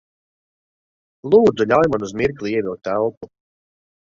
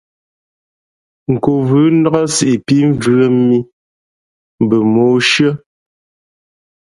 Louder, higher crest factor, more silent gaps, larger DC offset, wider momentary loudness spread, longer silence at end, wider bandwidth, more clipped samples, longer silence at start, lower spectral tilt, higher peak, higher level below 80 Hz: second, -18 LUFS vs -12 LUFS; first, 20 dB vs 14 dB; second, 3.17-3.21 s vs 3.73-4.58 s; neither; about the same, 9 LU vs 7 LU; second, 0.9 s vs 1.35 s; second, 7.4 kHz vs 11.5 kHz; neither; about the same, 1.25 s vs 1.3 s; about the same, -6.5 dB/octave vs -5.5 dB/octave; about the same, -2 dBFS vs 0 dBFS; about the same, -52 dBFS vs -52 dBFS